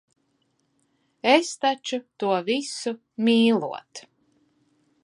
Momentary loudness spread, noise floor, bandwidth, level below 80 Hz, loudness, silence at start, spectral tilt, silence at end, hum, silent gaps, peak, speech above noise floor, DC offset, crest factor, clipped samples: 14 LU; -70 dBFS; 11 kHz; -78 dBFS; -23 LUFS; 1.25 s; -4 dB/octave; 1.05 s; none; none; -2 dBFS; 47 dB; under 0.1%; 24 dB; under 0.1%